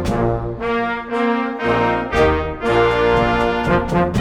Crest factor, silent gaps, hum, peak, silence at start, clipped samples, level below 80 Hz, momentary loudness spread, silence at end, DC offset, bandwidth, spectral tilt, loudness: 14 dB; none; none; -2 dBFS; 0 s; under 0.1%; -32 dBFS; 5 LU; 0 s; under 0.1%; 12 kHz; -7 dB/octave; -18 LUFS